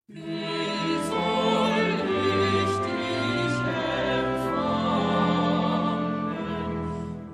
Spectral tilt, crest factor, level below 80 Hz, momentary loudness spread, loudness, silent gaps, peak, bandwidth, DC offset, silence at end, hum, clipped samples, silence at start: -6 dB/octave; 14 dB; -52 dBFS; 7 LU; -26 LUFS; none; -10 dBFS; 13 kHz; under 0.1%; 0 s; none; under 0.1%; 0.1 s